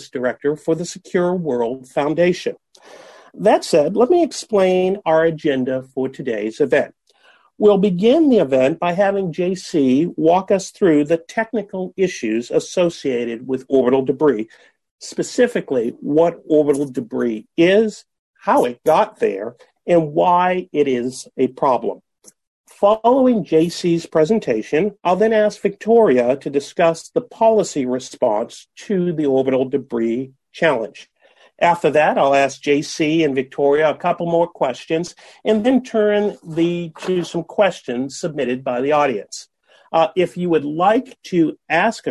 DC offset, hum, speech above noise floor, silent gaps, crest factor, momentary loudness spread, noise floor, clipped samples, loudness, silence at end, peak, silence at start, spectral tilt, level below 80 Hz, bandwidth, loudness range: under 0.1%; none; 37 dB; 14.91-14.98 s, 18.19-18.34 s, 22.47-22.64 s; 14 dB; 9 LU; -54 dBFS; under 0.1%; -18 LUFS; 0 s; -4 dBFS; 0 s; -6 dB/octave; -60 dBFS; 12.5 kHz; 3 LU